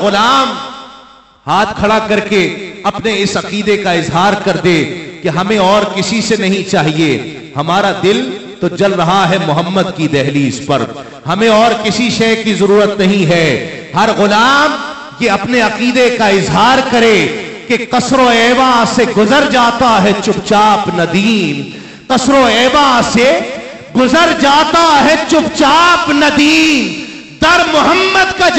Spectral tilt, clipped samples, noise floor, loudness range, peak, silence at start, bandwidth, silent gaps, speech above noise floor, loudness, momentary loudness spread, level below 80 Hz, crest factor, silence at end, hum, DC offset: -4.5 dB/octave; under 0.1%; -39 dBFS; 4 LU; 0 dBFS; 0 s; 15 kHz; none; 29 dB; -10 LUFS; 10 LU; -40 dBFS; 10 dB; 0 s; none; 0.3%